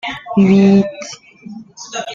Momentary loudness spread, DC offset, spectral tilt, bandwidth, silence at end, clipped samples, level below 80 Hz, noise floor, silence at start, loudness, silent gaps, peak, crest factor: 24 LU; under 0.1%; -6.5 dB/octave; 7.4 kHz; 0 s; under 0.1%; -50 dBFS; -35 dBFS; 0.05 s; -12 LUFS; none; -2 dBFS; 14 dB